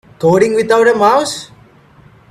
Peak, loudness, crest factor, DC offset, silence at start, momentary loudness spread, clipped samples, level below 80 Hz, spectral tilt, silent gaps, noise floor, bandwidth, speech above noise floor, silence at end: 0 dBFS; -11 LUFS; 14 dB; under 0.1%; 0.2 s; 10 LU; under 0.1%; -52 dBFS; -5 dB/octave; none; -44 dBFS; 13.5 kHz; 33 dB; 0.85 s